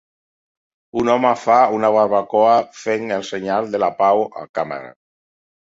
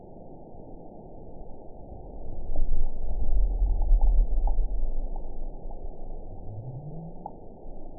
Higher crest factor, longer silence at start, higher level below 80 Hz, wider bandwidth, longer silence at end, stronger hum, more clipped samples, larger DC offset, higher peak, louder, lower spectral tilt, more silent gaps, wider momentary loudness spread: about the same, 16 dB vs 14 dB; first, 0.95 s vs 0.05 s; second, -60 dBFS vs -26 dBFS; first, 7.8 kHz vs 1 kHz; first, 0.85 s vs 0 s; neither; neither; second, under 0.1% vs 0.3%; first, -2 dBFS vs -10 dBFS; first, -18 LUFS vs -34 LUFS; second, -5.5 dB/octave vs -16 dB/octave; first, 4.49-4.54 s vs none; second, 11 LU vs 19 LU